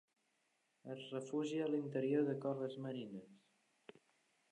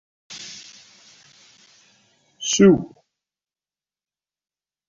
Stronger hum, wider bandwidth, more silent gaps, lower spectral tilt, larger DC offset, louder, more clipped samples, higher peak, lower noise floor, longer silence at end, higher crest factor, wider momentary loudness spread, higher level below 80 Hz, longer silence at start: second, none vs 50 Hz at -40 dBFS; first, 10.5 kHz vs 7.6 kHz; neither; first, -7 dB/octave vs -5.5 dB/octave; neither; second, -41 LUFS vs -17 LUFS; neither; second, -26 dBFS vs -4 dBFS; second, -82 dBFS vs under -90 dBFS; second, 1.15 s vs 2.05 s; about the same, 18 dB vs 22 dB; second, 15 LU vs 25 LU; second, under -90 dBFS vs -58 dBFS; first, 0.85 s vs 0.3 s